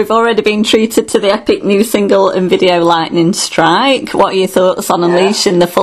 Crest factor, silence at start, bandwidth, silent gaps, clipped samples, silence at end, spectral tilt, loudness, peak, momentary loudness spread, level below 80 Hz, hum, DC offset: 10 dB; 0 s; 14 kHz; none; 0.4%; 0 s; -4.5 dB/octave; -11 LUFS; 0 dBFS; 3 LU; -46 dBFS; none; under 0.1%